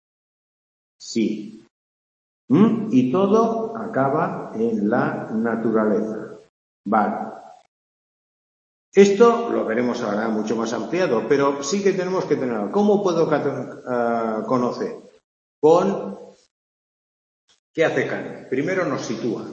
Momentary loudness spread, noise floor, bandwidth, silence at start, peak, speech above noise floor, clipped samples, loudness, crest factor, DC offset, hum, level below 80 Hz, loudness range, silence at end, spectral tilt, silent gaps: 13 LU; under -90 dBFS; 7.8 kHz; 1 s; 0 dBFS; over 70 dB; under 0.1%; -21 LUFS; 20 dB; under 0.1%; none; -68 dBFS; 5 LU; 0 s; -6 dB/octave; 1.71-2.48 s, 6.49-6.84 s, 7.68-8.92 s, 15.24-15.62 s, 16.51-17.48 s, 17.59-17.74 s